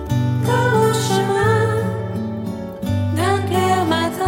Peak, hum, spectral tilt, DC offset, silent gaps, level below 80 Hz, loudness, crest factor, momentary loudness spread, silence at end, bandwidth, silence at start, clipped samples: -4 dBFS; none; -6 dB/octave; under 0.1%; none; -44 dBFS; -19 LUFS; 14 dB; 9 LU; 0 s; 17 kHz; 0 s; under 0.1%